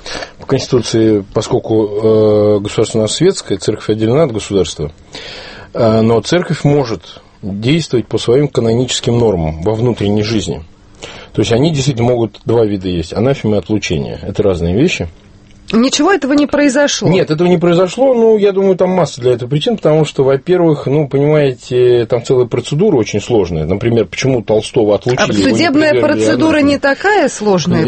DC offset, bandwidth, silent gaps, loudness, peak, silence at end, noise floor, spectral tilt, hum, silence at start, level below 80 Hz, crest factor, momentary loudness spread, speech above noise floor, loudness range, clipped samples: under 0.1%; 8.8 kHz; none; -12 LUFS; 0 dBFS; 0 s; -32 dBFS; -5.5 dB/octave; none; 0.05 s; -38 dBFS; 12 dB; 7 LU; 21 dB; 4 LU; under 0.1%